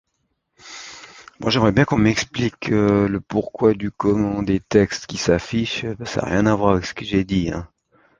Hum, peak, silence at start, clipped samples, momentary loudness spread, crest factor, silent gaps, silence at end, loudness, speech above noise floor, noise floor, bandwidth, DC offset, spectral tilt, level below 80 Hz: none; -2 dBFS; 0.65 s; under 0.1%; 10 LU; 20 dB; none; 0.55 s; -20 LUFS; 53 dB; -72 dBFS; 9.4 kHz; under 0.1%; -6 dB/octave; -42 dBFS